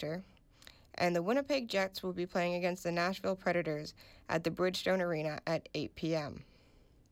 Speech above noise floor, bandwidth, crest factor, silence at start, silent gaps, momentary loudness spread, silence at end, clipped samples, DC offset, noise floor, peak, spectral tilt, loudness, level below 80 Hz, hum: 29 dB; 16.5 kHz; 16 dB; 0 s; none; 9 LU; 0.7 s; under 0.1%; under 0.1%; -64 dBFS; -20 dBFS; -5.5 dB/octave; -35 LUFS; -66 dBFS; none